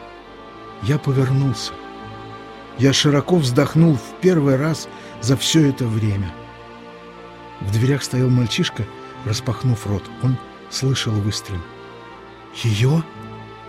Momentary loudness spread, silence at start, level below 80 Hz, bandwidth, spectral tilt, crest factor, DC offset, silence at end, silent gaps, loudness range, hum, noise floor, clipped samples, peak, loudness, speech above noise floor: 22 LU; 0 s; -48 dBFS; 15 kHz; -5.5 dB/octave; 18 dB; under 0.1%; 0 s; none; 6 LU; none; -39 dBFS; under 0.1%; -2 dBFS; -19 LUFS; 21 dB